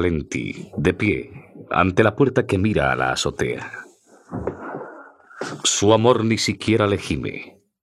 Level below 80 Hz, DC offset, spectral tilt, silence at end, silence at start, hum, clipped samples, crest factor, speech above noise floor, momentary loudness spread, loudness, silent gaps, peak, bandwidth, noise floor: -46 dBFS; under 0.1%; -4.5 dB/octave; 0.35 s; 0 s; none; under 0.1%; 20 dB; 23 dB; 18 LU; -20 LUFS; none; 0 dBFS; 13.5 kHz; -43 dBFS